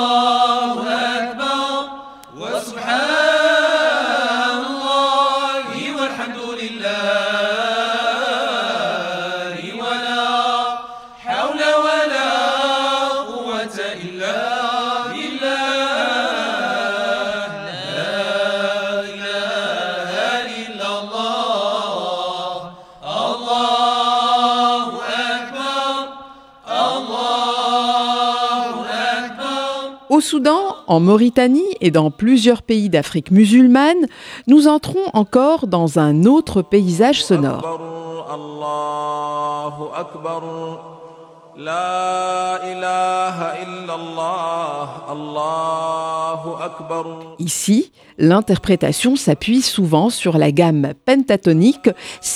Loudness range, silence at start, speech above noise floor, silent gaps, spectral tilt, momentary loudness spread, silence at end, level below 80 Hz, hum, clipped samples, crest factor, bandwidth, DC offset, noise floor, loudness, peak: 9 LU; 0 s; 26 dB; none; -5 dB/octave; 13 LU; 0 s; -54 dBFS; none; under 0.1%; 18 dB; 15 kHz; under 0.1%; -41 dBFS; -17 LUFS; 0 dBFS